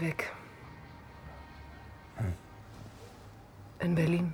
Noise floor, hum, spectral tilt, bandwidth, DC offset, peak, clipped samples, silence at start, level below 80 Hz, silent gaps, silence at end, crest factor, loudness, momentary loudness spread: -52 dBFS; none; -7.5 dB/octave; 17 kHz; under 0.1%; -18 dBFS; under 0.1%; 0 s; -56 dBFS; none; 0 s; 18 dB; -34 LUFS; 22 LU